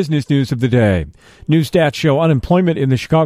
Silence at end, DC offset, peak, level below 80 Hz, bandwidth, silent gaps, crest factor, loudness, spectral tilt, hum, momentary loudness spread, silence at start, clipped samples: 0 s; under 0.1%; -2 dBFS; -38 dBFS; 14 kHz; none; 14 dB; -15 LUFS; -7.5 dB/octave; none; 4 LU; 0 s; under 0.1%